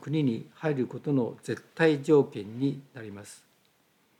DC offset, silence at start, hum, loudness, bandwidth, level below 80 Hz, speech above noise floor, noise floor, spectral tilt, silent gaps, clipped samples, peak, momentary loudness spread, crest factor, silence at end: under 0.1%; 0 s; none; -28 LUFS; 13 kHz; -82 dBFS; 39 dB; -67 dBFS; -7 dB/octave; none; under 0.1%; -10 dBFS; 19 LU; 18 dB; 0.85 s